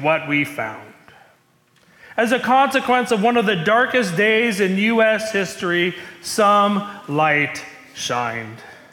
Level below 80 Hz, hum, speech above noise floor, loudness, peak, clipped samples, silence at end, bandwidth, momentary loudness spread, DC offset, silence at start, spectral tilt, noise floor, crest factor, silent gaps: -64 dBFS; none; 39 dB; -18 LUFS; -6 dBFS; under 0.1%; 0.2 s; 18 kHz; 13 LU; under 0.1%; 0 s; -4.5 dB/octave; -58 dBFS; 14 dB; none